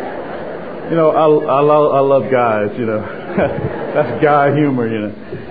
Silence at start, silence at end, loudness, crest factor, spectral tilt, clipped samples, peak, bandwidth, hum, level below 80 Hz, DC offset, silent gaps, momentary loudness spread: 0 s; 0 s; -14 LUFS; 14 dB; -11 dB/octave; under 0.1%; 0 dBFS; 4.9 kHz; none; -48 dBFS; 1%; none; 14 LU